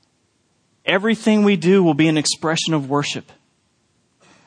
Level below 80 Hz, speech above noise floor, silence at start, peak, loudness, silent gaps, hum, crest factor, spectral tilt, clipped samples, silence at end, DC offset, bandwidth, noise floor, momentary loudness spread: -66 dBFS; 47 dB; 0.85 s; -2 dBFS; -17 LUFS; none; none; 18 dB; -5 dB/octave; under 0.1%; 1.25 s; under 0.1%; 10.5 kHz; -64 dBFS; 9 LU